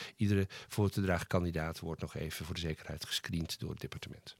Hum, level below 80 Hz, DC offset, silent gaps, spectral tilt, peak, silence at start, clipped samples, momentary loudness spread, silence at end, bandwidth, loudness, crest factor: none; -58 dBFS; under 0.1%; none; -5.5 dB/octave; -16 dBFS; 0 s; under 0.1%; 9 LU; 0.05 s; 16.5 kHz; -37 LUFS; 20 dB